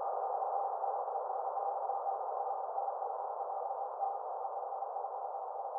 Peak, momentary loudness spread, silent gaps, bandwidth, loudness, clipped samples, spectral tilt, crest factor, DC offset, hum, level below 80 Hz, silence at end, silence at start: -24 dBFS; 4 LU; none; 1.9 kHz; -38 LUFS; under 0.1%; 22.5 dB/octave; 14 dB; under 0.1%; none; under -90 dBFS; 0 s; 0 s